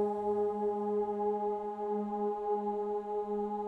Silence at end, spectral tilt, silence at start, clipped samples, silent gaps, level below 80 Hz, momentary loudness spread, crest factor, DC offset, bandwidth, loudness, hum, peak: 0 s; -9 dB/octave; 0 s; under 0.1%; none; -68 dBFS; 3 LU; 12 dB; under 0.1%; 4.2 kHz; -34 LUFS; none; -22 dBFS